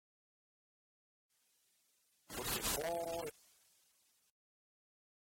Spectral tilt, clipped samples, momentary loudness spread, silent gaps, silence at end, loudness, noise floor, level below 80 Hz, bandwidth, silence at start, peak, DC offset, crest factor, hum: -2 dB/octave; under 0.1%; 12 LU; none; 1.95 s; -40 LUFS; -78 dBFS; -64 dBFS; 17 kHz; 2.3 s; -26 dBFS; under 0.1%; 22 dB; none